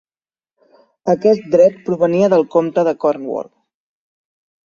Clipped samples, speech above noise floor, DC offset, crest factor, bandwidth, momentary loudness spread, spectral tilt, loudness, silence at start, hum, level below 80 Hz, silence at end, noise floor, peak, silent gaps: under 0.1%; over 76 dB; under 0.1%; 16 dB; 7.2 kHz; 13 LU; -7.5 dB/octave; -15 LUFS; 1.05 s; none; -62 dBFS; 1.25 s; under -90 dBFS; 0 dBFS; none